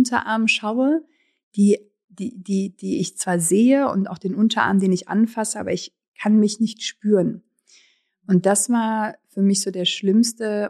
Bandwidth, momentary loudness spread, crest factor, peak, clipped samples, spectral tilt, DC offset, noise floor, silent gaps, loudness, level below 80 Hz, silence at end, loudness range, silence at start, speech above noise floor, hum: 13 kHz; 9 LU; 16 dB; -4 dBFS; under 0.1%; -4.5 dB/octave; under 0.1%; -59 dBFS; 1.43-1.51 s, 2.04-2.08 s, 6.08-6.12 s; -20 LUFS; -68 dBFS; 0 s; 2 LU; 0 s; 39 dB; none